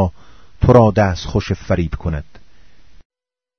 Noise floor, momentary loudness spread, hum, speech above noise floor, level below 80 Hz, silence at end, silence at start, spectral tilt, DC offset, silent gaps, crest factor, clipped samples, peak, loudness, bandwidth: -50 dBFS; 14 LU; none; 35 dB; -32 dBFS; 1.35 s; 0 s; -8 dB/octave; 1%; none; 18 dB; 0.1%; 0 dBFS; -16 LUFS; 6.6 kHz